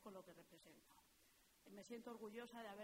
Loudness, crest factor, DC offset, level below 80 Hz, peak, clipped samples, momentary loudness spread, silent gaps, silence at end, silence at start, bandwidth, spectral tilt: -58 LUFS; 18 dB; under 0.1%; -88 dBFS; -42 dBFS; under 0.1%; 12 LU; none; 0 s; 0 s; 16 kHz; -4 dB/octave